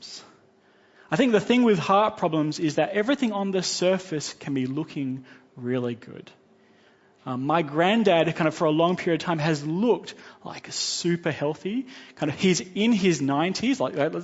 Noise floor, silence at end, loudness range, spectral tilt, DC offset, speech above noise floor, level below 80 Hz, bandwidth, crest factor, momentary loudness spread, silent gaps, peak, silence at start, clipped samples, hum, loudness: -59 dBFS; 0 s; 6 LU; -5 dB/octave; under 0.1%; 35 dB; -68 dBFS; 8 kHz; 18 dB; 15 LU; none; -6 dBFS; 0 s; under 0.1%; none; -24 LUFS